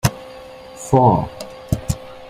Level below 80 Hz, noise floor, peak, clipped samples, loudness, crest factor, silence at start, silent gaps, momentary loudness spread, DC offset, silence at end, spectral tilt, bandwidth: -38 dBFS; -37 dBFS; -2 dBFS; under 0.1%; -19 LUFS; 18 dB; 0.05 s; none; 23 LU; under 0.1%; 0 s; -6.5 dB/octave; 15.5 kHz